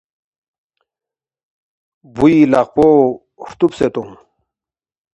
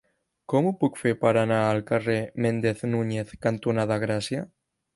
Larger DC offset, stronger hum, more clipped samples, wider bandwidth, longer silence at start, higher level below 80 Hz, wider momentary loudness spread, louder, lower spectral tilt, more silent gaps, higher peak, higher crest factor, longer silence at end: neither; neither; neither; second, 8.2 kHz vs 11.5 kHz; first, 2.15 s vs 0.5 s; first, -48 dBFS vs -60 dBFS; first, 19 LU vs 6 LU; first, -13 LUFS vs -25 LUFS; about the same, -8 dB/octave vs -7 dB/octave; neither; first, 0 dBFS vs -6 dBFS; about the same, 16 dB vs 18 dB; first, 1.05 s vs 0.5 s